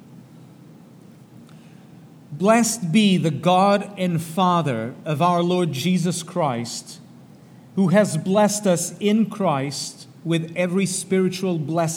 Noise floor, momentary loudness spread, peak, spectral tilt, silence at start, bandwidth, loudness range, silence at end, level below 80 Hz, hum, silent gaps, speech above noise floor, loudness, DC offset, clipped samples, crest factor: -46 dBFS; 10 LU; -4 dBFS; -5 dB/octave; 0.1 s; 16.5 kHz; 3 LU; 0 s; -72 dBFS; none; none; 26 dB; -21 LUFS; under 0.1%; under 0.1%; 18 dB